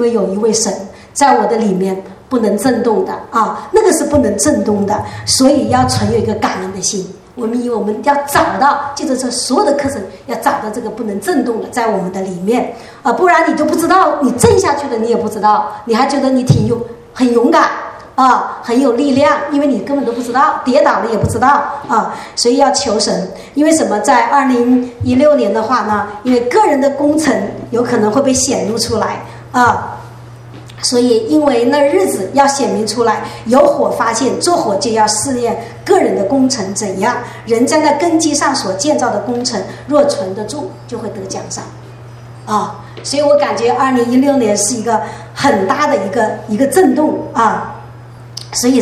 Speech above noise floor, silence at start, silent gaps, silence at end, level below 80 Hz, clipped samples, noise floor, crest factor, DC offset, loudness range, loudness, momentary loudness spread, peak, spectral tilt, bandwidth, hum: 20 dB; 0 s; none; 0 s; -44 dBFS; under 0.1%; -33 dBFS; 12 dB; under 0.1%; 3 LU; -13 LUFS; 11 LU; 0 dBFS; -4.5 dB/octave; 15 kHz; none